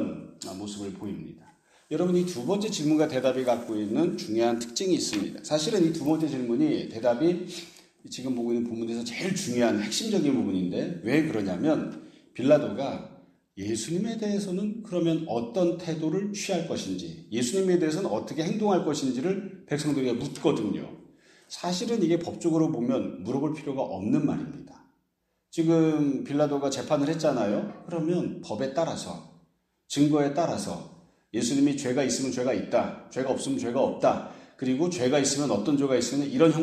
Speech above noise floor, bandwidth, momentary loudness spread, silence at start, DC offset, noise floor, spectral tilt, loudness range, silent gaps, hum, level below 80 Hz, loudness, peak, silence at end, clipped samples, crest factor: 50 dB; 14 kHz; 12 LU; 0 s; under 0.1%; -76 dBFS; -5.5 dB/octave; 3 LU; none; none; -68 dBFS; -27 LUFS; -6 dBFS; 0 s; under 0.1%; 20 dB